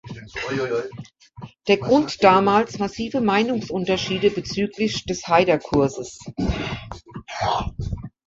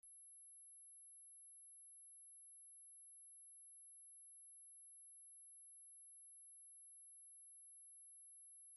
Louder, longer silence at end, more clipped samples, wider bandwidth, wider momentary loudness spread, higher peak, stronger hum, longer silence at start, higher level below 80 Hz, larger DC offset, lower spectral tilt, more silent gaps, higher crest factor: first, -21 LUFS vs -59 LUFS; first, 0.2 s vs 0 s; neither; second, 7.8 kHz vs 16 kHz; first, 17 LU vs 0 LU; first, -2 dBFS vs -58 dBFS; neither; about the same, 0.05 s vs 0.05 s; first, -40 dBFS vs under -90 dBFS; neither; first, -5.5 dB/octave vs 3.5 dB/octave; neither; first, 20 dB vs 4 dB